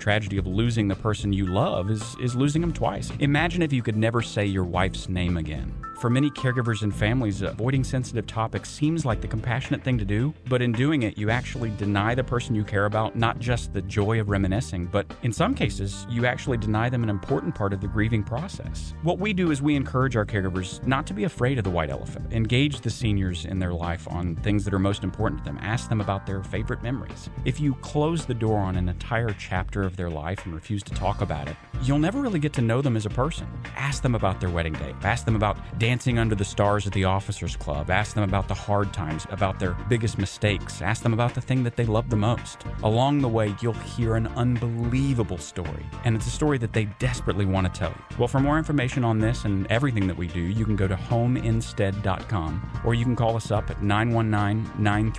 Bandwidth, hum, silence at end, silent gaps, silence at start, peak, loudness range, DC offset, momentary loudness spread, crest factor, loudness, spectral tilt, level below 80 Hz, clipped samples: 11 kHz; none; 0 s; none; 0 s; -6 dBFS; 2 LU; under 0.1%; 7 LU; 18 dB; -26 LUFS; -6.5 dB/octave; -38 dBFS; under 0.1%